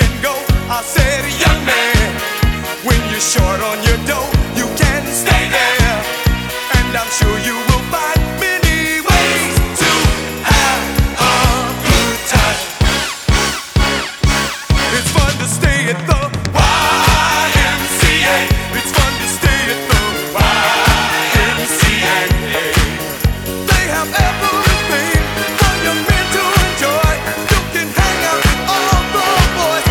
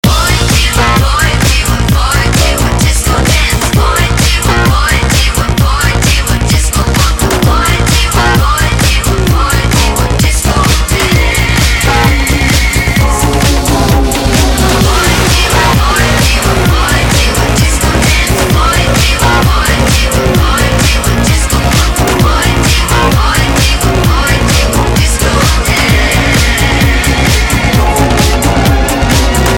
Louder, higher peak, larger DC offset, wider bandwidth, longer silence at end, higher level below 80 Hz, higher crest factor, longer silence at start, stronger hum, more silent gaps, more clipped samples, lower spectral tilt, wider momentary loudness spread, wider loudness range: second, -13 LUFS vs -9 LUFS; about the same, 0 dBFS vs 0 dBFS; neither; about the same, over 20 kHz vs 18.5 kHz; about the same, 0 s vs 0 s; second, -20 dBFS vs -12 dBFS; first, 14 dB vs 8 dB; about the same, 0 s vs 0.05 s; neither; neither; neither; about the same, -3.5 dB/octave vs -4 dB/octave; first, 5 LU vs 2 LU; about the same, 2 LU vs 1 LU